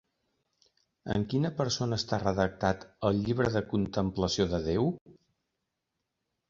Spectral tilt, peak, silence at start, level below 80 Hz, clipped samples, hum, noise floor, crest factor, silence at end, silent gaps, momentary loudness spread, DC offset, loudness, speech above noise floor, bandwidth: -6 dB/octave; -10 dBFS; 1.05 s; -50 dBFS; under 0.1%; none; -84 dBFS; 20 dB; 1.4 s; 5.01-5.06 s; 4 LU; under 0.1%; -30 LUFS; 55 dB; 7.6 kHz